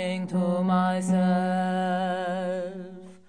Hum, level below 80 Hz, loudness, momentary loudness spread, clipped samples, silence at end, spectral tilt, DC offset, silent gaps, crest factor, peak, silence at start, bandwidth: none; -70 dBFS; -26 LUFS; 10 LU; under 0.1%; 0.1 s; -7 dB/octave; 0.2%; none; 12 dB; -14 dBFS; 0 s; 10 kHz